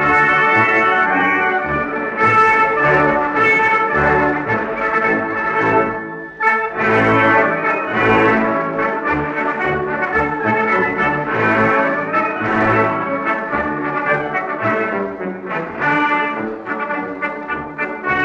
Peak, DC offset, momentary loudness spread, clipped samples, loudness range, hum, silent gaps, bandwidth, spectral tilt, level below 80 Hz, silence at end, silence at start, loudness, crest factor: -2 dBFS; under 0.1%; 10 LU; under 0.1%; 5 LU; none; none; 9 kHz; -7 dB/octave; -46 dBFS; 0 s; 0 s; -16 LUFS; 16 dB